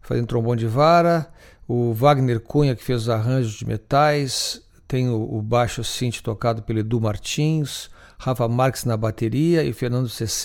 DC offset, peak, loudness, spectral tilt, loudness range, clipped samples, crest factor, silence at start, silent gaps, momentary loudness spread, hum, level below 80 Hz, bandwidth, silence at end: under 0.1%; -4 dBFS; -21 LUFS; -6 dB/octave; 4 LU; under 0.1%; 18 dB; 0.05 s; none; 9 LU; none; -44 dBFS; 17 kHz; 0 s